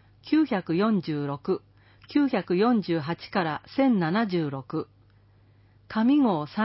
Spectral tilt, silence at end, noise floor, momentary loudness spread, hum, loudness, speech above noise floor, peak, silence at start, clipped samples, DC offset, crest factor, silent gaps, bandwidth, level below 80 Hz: -11 dB/octave; 0 s; -58 dBFS; 9 LU; none; -26 LUFS; 33 dB; -12 dBFS; 0.25 s; under 0.1%; under 0.1%; 14 dB; none; 5.8 kHz; -64 dBFS